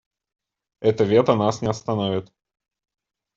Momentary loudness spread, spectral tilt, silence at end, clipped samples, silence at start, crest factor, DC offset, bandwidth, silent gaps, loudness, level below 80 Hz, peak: 9 LU; -6.5 dB/octave; 1.1 s; under 0.1%; 0.8 s; 20 dB; under 0.1%; 7.8 kHz; none; -21 LUFS; -60 dBFS; -4 dBFS